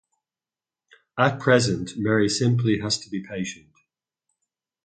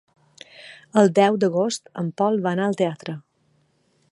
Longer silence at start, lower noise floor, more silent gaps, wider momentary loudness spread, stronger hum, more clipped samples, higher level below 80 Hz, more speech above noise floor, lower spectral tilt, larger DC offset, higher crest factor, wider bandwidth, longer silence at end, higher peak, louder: first, 1.15 s vs 0.6 s; first, under -90 dBFS vs -65 dBFS; neither; second, 13 LU vs 21 LU; neither; neither; first, -56 dBFS vs -72 dBFS; first, over 68 dB vs 44 dB; about the same, -5 dB/octave vs -6 dB/octave; neither; about the same, 22 dB vs 20 dB; second, 9.4 kHz vs 11.5 kHz; first, 1.3 s vs 0.95 s; about the same, -4 dBFS vs -4 dBFS; about the same, -23 LUFS vs -21 LUFS